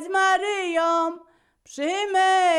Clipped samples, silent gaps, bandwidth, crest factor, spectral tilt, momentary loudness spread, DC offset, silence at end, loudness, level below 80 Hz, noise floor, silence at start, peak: under 0.1%; none; 11.5 kHz; 12 dB; 0 dB/octave; 12 LU; under 0.1%; 0 s; -22 LUFS; -70 dBFS; -56 dBFS; 0 s; -10 dBFS